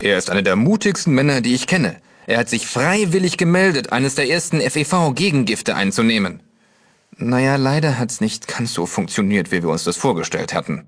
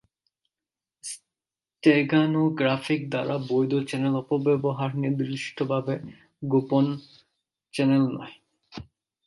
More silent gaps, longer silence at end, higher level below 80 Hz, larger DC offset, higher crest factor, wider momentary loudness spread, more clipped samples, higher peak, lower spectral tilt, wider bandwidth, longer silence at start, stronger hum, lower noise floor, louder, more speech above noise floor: neither; second, 0.05 s vs 0.45 s; first, -54 dBFS vs -66 dBFS; neither; about the same, 16 dB vs 20 dB; second, 6 LU vs 18 LU; neither; first, -2 dBFS vs -6 dBFS; second, -4.5 dB/octave vs -6.5 dB/octave; about the same, 11 kHz vs 11.5 kHz; second, 0 s vs 1.05 s; neither; second, -56 dBFS vs under -90 dBFS; first, -18 LUFS vs -25 LUFS; second, 39 dB vs over 66 dB